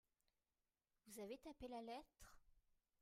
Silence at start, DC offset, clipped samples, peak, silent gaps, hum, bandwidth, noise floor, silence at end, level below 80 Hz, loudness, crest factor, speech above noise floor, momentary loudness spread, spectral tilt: 1.05 s; under 0.1%; under 0.1%; -42 dBFS; none; none; 15.5 kHz; under -90 dBFS; 0.4 s; -76 dBFS; -56 LUFS; 18 dB; over 34 dB; 15 LU; -4 dB/octave